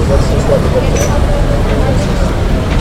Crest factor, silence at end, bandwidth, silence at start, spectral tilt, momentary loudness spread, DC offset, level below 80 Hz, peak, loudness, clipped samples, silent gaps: 10 dB; 0 s; 15 kHz; 0 s; -6 dB/octave; 3 LU; under 0.1%; -14 dBFS; 0 dBFS; -13 LUFS; under 0.1%; none